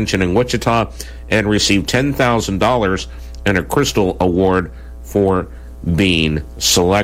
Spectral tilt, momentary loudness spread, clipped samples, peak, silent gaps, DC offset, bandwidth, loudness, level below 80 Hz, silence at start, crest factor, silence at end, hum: -4.5 dB/octave; 10 LU; under 0.1%; -4 dBFS; none; under 0.1%; 16.5 kHz; -16 LUFS; -32 dBFS; 0 s; 12 dB; 0 s; none